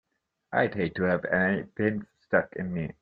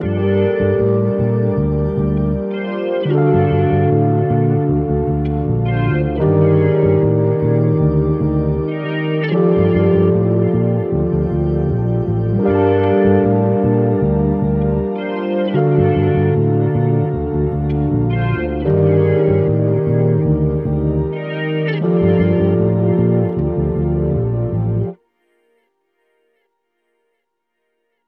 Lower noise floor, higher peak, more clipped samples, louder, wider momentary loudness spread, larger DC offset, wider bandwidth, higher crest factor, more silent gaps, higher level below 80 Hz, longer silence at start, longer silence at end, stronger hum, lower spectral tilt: second, -47 dBFS vs -73 dBFS; second, -6 dBFS vs 0 dBFS; neither; second, -28 LUFS vs -16 LUFS; first, 8 LU vs 5 LU; neither; first, 5 kHz vs 4.4 kHz; first, 22 dB vs 14 dB; neither; second, -60 dBFS vs -32 dBFS; first, 0.5 s vs 0 s; second, 0.1 s vs 3.15 s; neither; second, -10 dB/octave vs -12 dB/octave